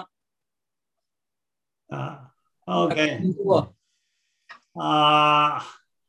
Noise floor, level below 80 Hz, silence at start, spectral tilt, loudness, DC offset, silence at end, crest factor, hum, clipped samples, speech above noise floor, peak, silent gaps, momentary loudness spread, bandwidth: -89 dBFS; -64 dBFS; 0 s; -5.5 dB/octave; -21 LUFS; under 0.1%; 0.35 s; 20 dB; none; under 0.1%; 67 dB; -6 dBFS; none; 21 LU; 10.5 kHz